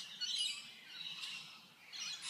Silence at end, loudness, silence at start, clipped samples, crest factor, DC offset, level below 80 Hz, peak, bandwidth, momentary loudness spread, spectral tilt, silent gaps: 0 s; -42 LUFS; 0 s; under 0.1%; 20 dB; under 0.1%; under -90 dBFS; -26 dBFS; 15.5 kHz; 15 LU; 2 dB/octave; none